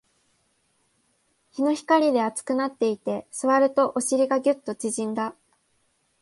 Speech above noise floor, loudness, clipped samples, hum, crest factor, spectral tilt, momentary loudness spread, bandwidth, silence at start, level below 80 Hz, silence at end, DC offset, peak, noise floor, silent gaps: 46 dB; -24 LUFS; under 0.1%; none; 18 dB; -4 dB/octave; 10 LU; 11.5 kHz; 1.55 s; -74 dBFS; 0.9 s; under 0.1%; -6 dBFS; -69 dBFS; none